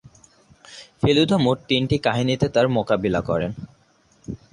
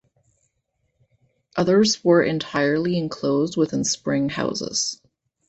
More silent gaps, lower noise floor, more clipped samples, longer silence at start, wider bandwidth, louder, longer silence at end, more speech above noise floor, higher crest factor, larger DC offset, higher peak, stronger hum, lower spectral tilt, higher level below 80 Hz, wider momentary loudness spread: neither; second, -58 dBFS vs -73 dBFS; neither; second, 0.7 s vs 1.55 s; first, 11.5 kHz vs 8.4 kHz; about the same, -21 LUFS vs -21 LUFS; second, 0.15 s vs 0.55 s; second, 38 dB vs 52 dB; about the same, 18 dB vs 18 dB; neither; about the same, -4 dBFS vs -4 dBFS; neither; first, -6.5 dB/octave vs -4.5 dB/octave; first, -46 dBFS vs -58 dBFS; first, 19 LU vs 7 LU